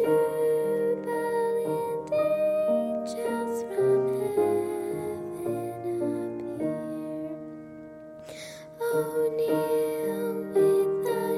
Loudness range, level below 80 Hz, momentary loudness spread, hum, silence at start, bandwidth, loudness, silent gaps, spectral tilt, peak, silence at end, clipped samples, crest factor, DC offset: 7 LU; -68 dBFS; 16 LU; none; 0 s; 14.5 kHz; -28 LUFS; none; -6.5 dB/octave; -14 dBFS; 0 s; under 0.1%; 14 dB; under 0.1%